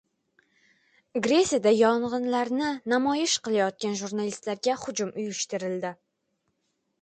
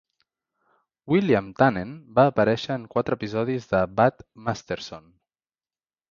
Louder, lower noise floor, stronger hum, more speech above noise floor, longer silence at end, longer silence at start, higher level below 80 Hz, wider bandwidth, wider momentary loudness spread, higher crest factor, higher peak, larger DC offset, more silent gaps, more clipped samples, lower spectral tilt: about the same, -26 LUFS vs -24 LUFS; second, -77 dBFS vs under -90 dBFS; neither; second, 51 dB vs over 67 dB; about the same, 1.1 s vs 1.15 s; about the same, 1.15 s vs 1.05 s; second, -68 dBFS vs -56 dBFS; first, 9.4 kHz vs 7.4 kHz; second, 9 LU vs 13 LU; about the same, 18 dB vs 22 dB; second, -10 dBFS vs -4 dBFS; neither; neither; neither; second, -3.5 dB/octave vs -7 dB/octave